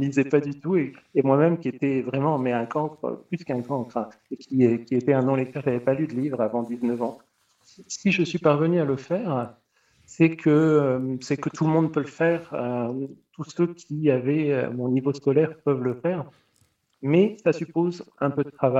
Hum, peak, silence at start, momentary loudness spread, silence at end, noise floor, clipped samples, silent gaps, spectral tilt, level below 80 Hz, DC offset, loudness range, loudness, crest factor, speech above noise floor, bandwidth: none; -6 dBFS; 0 s; 10 LU; 0 s; -67 dBFS; under 0.1%; none; -7.5 dB/octave; -68 dBFS; under 0.1%; 3 LU; -24 LUFS; 18 dB; 43 dB; 8.2 kHz